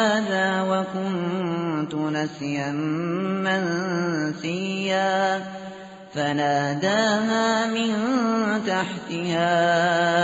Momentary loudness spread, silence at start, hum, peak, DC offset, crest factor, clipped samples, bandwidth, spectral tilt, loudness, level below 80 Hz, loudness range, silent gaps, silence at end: 7 LU; 0 s; none; -8 dBFS; under 0.1%; 16 dB; under 0.1%; 8 kHz; -4 dB/octave; -23 LUFS; -66 dBFS; 3 LU; none; 0 s